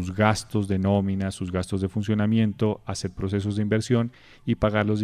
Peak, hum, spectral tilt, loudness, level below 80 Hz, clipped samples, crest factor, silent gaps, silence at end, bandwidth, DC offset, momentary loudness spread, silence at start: -4 dBFS; none; -6.5 dB/octave; -25 LUFS; -48 dBFS; under 0.1%; 20 dB; none; 0 s; 12 kHz; under 0.1%; 7 LU; 0 s